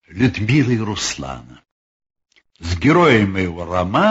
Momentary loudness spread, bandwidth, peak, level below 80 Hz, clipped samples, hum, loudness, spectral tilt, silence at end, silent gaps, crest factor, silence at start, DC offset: 16 LU; 8 kHz; -2 dBFS; -42 dBFS; under 0.1%; none; -17 LUFS; -5.5 dB/octave; 0 s; 1.71-2.00 s; 16 dB; 0.1 s; under 0.1%